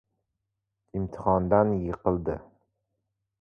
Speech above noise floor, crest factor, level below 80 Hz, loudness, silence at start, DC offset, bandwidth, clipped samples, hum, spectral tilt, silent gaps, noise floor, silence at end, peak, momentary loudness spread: 57 dB; 22 dB; -48 dBFS; -27 LUFS; 0.95 s; under 0.1%; 6.4 kHz; under 0.1%; none; -11.5 dB/octave; none; -83 dBFS; 1 s; -6 dBFS; 13 LU